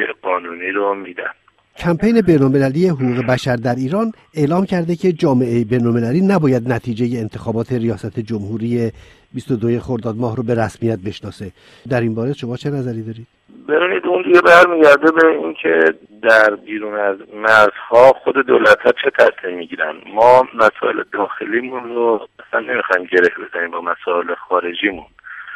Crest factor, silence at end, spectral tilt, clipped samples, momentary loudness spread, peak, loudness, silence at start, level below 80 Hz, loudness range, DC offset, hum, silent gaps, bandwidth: 16 dB; 0 s; -7 dB/octave; 0.1%; 13 LU; 0 dBFS; -15 LUFS; 0 s; -50 dBFS; 9 LU; under 0.1%; none; none; 13.5 kHz